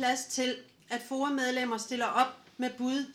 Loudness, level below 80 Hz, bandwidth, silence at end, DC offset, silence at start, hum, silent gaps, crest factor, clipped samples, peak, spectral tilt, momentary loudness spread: -32 LUFS; -84 dBFS; 16 kHz; 0 s; under 0.1%; 0 s; none; none; 20 dB; under 0.1%; -12 dBFS; -2 dB/octave; 8 LU